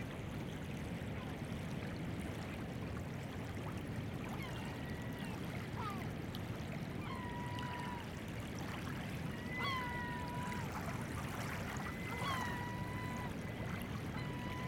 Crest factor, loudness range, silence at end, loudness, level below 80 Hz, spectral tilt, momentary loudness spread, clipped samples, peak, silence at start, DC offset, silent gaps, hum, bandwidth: 16 dB; 2 LU; 0 s; -43 LUFS; -56 dBFS; -5.5 dB/octave; 4 LU; under 0.1%; -28 dBFS; 0 s; under 0.1%; none; none; 17 kHz